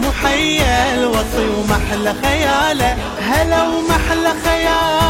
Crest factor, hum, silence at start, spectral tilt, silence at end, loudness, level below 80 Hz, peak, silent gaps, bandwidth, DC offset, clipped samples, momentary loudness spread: 14 dB; none; 0 s; -4 dB/octave; 0 s; -15 LUFS; -26 dBFS; -2 dBFS; none; 16.5 kHz; under 0.1%; under 0.1%; 4 LU